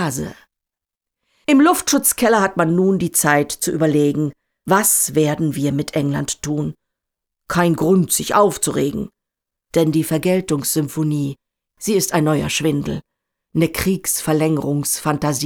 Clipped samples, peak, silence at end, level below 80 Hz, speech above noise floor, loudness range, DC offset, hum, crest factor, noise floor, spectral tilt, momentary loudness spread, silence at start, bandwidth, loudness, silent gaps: under 0.1%; -2 dBFS; 0 s; -48 dBFS; 68 dB; 4 LU; under 0.1%; none; 16 dB; -85 dBFS; -4.5 dB/octave; 10 LU; 0 s; over 20 kHz; -18 LUFS; none